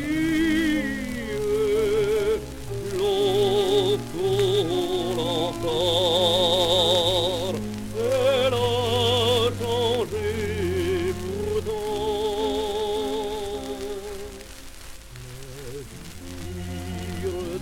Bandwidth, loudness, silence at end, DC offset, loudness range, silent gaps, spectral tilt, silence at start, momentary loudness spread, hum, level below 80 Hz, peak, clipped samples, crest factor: 17 kHz; -24 LUFS; 0 s; under 0.1%; 13 LU; none; -4.5 dB/octave; 0 s; 18 LU; none; -42 dBFS; -8 dBFS; under 0.1%; 16 dB